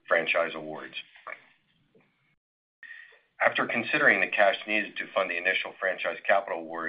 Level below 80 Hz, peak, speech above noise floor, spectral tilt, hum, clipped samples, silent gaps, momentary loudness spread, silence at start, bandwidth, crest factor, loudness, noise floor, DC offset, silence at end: -78 dBFS; -6 dBFS; 38 dB; -7 dB/octave; none; under 0.1%; 2.37-2.82 s; 22 LU; 0.1 s; 5.2 kHz; 22 dB; -26 LUFS; -66 dBFS; under 0.1%; 0 s